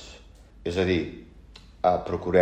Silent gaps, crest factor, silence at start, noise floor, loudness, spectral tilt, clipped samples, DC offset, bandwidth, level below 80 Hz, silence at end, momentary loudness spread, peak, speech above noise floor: none; 20 dB; 0 s; -49 dBFS; -27 LUFS; -6.5 dB/octave; under 0.1%; under 0.1%; 9.2 kHz; -48 dBFS; 0 s; 17 LU; -6 dBFS; 26 dB